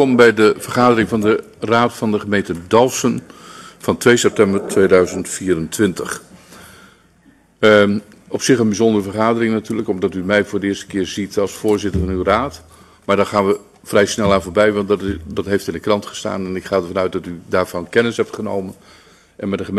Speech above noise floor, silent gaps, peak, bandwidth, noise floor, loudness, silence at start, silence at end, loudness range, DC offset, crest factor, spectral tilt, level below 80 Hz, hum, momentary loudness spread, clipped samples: 35 dB; none; 0 dBFS; 13.5 kHz; -52 dBFS; -17 LUFS; 0 s; 0 s; 4 LU; under 0.1%; 16 dB; -5 dB/octave; -44 dBFS; none; 11 LU; under 0.1%